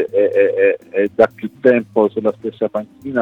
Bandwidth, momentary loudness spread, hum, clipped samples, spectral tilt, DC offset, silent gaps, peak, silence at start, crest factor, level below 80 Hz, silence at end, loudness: 5.4 kHz; 8 LU; none; under 0.1%; -8 dB/octave; under 0.1%; none; 0 dBFS; 0 s; 16 dB; -62 dBFS; 0 s; -17 LUFS